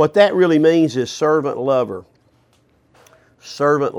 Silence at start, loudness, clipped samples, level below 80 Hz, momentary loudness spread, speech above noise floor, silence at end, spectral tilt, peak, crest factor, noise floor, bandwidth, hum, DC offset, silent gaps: 0 s; -16 LUFS; under 0.1%; -64 dBFS; 11 LU; 42 dB; 0 s; -6 dB/octave; -2 dBFS; 16 dB; -58 dBFS; 12 kHz; none; under 0.1%; none